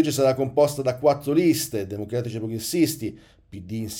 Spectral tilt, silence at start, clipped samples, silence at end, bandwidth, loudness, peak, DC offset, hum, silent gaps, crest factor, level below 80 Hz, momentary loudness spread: -5.5 dB/octave; 0 s; under 0.1%; 0 s; 19 kHz; -23 LUFS; -8 dBFS; under 0.1%; none; none; 16 dB; -56 dBFS; 13 LU